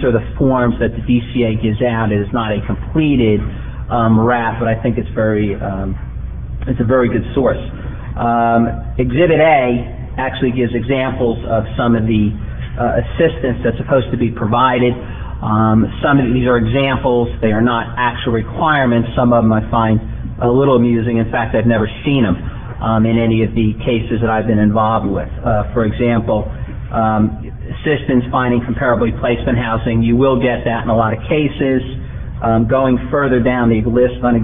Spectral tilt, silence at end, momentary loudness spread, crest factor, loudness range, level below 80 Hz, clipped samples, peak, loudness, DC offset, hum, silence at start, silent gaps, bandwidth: -11.5 dB/octave; 0 s; 8 LU; 14 dB; 3 LU; -28 dBFS; under 0.1%; 0 dBFS; -15 LUFS; 1%; none; 0 s; none; 3.8 kHz